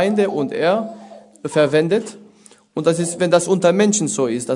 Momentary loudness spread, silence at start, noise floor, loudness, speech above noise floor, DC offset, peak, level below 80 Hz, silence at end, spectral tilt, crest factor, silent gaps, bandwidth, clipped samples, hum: 16 LU; 0 s; -49 dBFS; -18 LUFS; 31 dB; under 0.1%; 0 dBFS; -66 dBFS; 0 s; -4.5 dB/octave; 18 dB; none; 11 kHz; under 0.1%; none